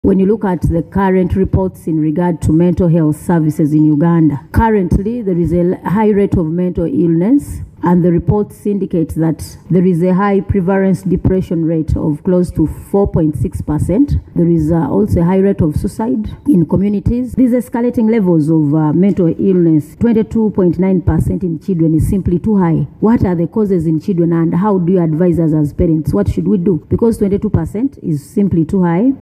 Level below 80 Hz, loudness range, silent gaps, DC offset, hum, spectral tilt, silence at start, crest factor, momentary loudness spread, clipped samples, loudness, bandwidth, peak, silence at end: -30 dBFS; 2 LU; none; under 0.1%; none; -9.5 dB/octave; 0.05 s; 12 dB; 5 LU; under 0.1%; -13 LUFS; 13.5 kHz; 0 dBFS; 0.1 s